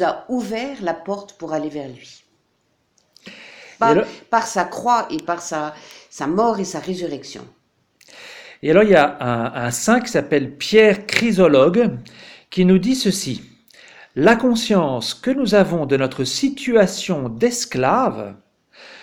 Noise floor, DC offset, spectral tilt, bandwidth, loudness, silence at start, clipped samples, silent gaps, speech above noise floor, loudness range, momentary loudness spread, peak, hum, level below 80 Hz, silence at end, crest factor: -66 dBFS; under 0.1%; -5 dB/octave; 17 kHz; -18 LUFS; 0 s; under 0.1%; none; 48 dB; 9 LU; 17 LU; 0 dBFS; none; -52 dBFS; 0.05 s; 18 dB